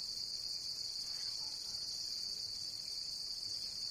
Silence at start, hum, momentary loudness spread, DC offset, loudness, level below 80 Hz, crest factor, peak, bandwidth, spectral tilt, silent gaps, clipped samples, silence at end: 0 s; none; 1 LU; under 0.1%; -40 LUFS; -70 dBFS; 14 dB; -28 dBFS; 15.5 kHz; 0.5 dB/octave; none; under 0.1%; 0 s